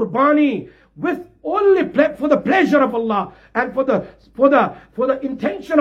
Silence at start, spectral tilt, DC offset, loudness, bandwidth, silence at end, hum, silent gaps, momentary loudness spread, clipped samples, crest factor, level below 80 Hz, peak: 0 s; -7 dB/octave; under 0.1%; -18 LUFS; 7.6 kHz; 0 s; none; none; 10 LU; under 0.1%; 16 dB; -54 dBFS; -2 dBFS